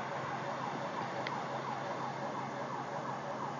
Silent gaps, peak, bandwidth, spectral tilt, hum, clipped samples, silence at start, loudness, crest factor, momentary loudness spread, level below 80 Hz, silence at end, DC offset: none; -22 dBFS; 7.6 kHz; -5 dB/octave; none; under 0.1%; 0 s; -39 LUFS; 18 dB; 2 LU; -78 dBFS; 0 s; under 0.1%